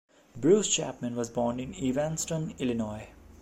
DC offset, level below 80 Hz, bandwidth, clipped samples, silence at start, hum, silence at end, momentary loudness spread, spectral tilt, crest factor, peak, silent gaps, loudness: under 0.1%; -56 dBFS; 16 kHz; under 0.1%; 0.35 s; none; 0.05 s; 10 LU; -4.5 dB/octave; 20 dB; -10 dBFS; none; -29 LUFS